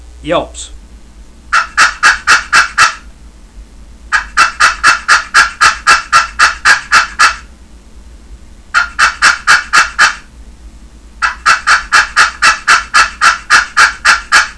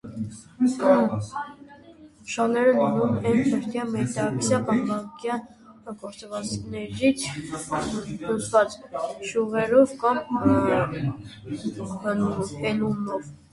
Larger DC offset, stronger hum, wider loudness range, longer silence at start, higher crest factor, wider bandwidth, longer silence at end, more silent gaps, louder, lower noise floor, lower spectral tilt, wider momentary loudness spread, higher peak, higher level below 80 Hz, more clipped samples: first, 0.3% vs under 0.1%; neither; about the same, 3 LU vs 5 LU; about the same, 0.15 s vs 0.05 s; second, 12 dB vs 20 dB; about the same, 11 kHz vs 11.5 kHz; about the same, 0.05 s vs 0.15 s; neither; first, -8 LUFS vs -25 LUFS; second, -35 dBFS vs -49 dBFS; second, 0.5 dB/octave vs -6 dB/octave; second, 9 LU vs 15 LU; first, 0 dBFS vs -6 dBFS; first, -34 dBFS vs -54 dBFS; first, 2% vs under 0.1%